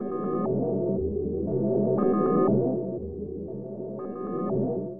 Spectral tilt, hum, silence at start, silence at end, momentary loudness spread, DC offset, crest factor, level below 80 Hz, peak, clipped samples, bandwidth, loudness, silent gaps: -14 dB/octave; none; 0 s; 0 s; 13 LU; under 0.1%; 14 dB; -50 dBFS; -12 dBFS; under 0.1%; 2.9 kHz; -27 LUFS; none